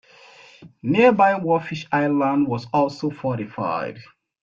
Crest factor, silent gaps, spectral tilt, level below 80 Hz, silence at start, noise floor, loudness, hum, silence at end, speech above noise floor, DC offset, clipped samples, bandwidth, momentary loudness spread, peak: 18 dB; none; -7.5 dB/octave; -62 dBFS; 0.6 s; -48 dBFS; -21 LUFS; none; 0.4 s; 28 dB; under 0.1%; under 0.1%; 7.4 kHz; 11 LU; -4 dBFS